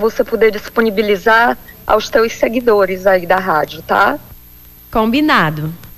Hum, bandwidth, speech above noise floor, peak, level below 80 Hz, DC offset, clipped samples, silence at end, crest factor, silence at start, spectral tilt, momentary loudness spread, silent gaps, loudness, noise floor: none; 15.5 kHz; 26 dB; -2 dBFS; -40 dBFS; under 0.1%; under 0.1%; 0.05 s; 12 dB; 0 s; -5 dB/octave; 6 LU; none; -14 LUFS; -40 dBFS